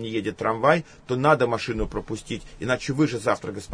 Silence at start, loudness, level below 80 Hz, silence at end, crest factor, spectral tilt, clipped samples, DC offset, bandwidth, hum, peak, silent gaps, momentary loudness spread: 0 s; -24 LUFS; -44 dBFS; 0 s; 20 dB; -6 dB/octave; under 0.1%; under 0.1%; 10.5 kHz; none; -4 dBFS; none; 12 LU